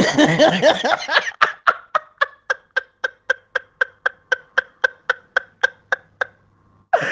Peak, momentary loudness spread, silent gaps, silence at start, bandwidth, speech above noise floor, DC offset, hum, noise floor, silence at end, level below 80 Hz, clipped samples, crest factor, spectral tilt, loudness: 0 dBFS; 12 LU; none; 0 s; 9.8 kHz; 40 dB; under 0.1%; none; -56 dBFS; 0 s; -62 dBFS; under 0.1%; 20 dB; -4 dB/octave; -20 LUFS